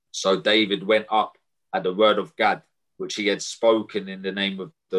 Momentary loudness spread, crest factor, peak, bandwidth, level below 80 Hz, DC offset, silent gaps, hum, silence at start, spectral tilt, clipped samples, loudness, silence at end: 11 LU; 18 dB; -6 dBFS; 11.5 kHz; -70 dBFS; under 0.1%; none; none; 0.15 s; -3.5 dB/octave; under 0.1%; -23 LUFS; 0 s